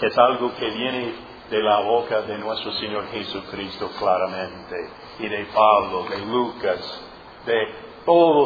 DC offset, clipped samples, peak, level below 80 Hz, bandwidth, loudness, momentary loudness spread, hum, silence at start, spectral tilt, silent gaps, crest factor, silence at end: under 0.1%; under 0.1%; 0 dBFS; -56 dBFS; 5 kHz; -23 LUFS; 16 LU; none; 0 s; -6.5 dB/octave; none; 22 dB; 0 s